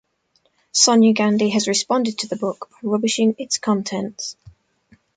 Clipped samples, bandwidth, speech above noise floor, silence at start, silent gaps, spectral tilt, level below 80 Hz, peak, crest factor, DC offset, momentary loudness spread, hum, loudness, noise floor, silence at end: under 0.1%; 9.4 kHz; 46 dB; 0.75 s; none; -3.5 dB/octave; -64 dBFS; -2 dBFS; 18 dB; under 0.1%; 13 LU; none; -19 LUFS; -65 dBFS; 0.85 s